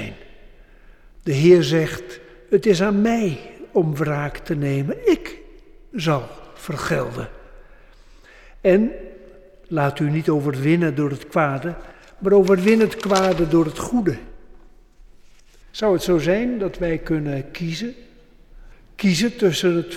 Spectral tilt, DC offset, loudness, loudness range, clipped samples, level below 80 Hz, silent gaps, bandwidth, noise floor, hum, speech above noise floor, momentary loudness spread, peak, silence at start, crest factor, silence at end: -6.5 dB/octave; under 0.1%; -20 LUFS; 6 LU; under 0.1%; -44 dBFS; none; 15 kHz; -47 dBFS; none; 28 dB; 17 LU; -4 dBFS; 0 s; 18 dB; 0 s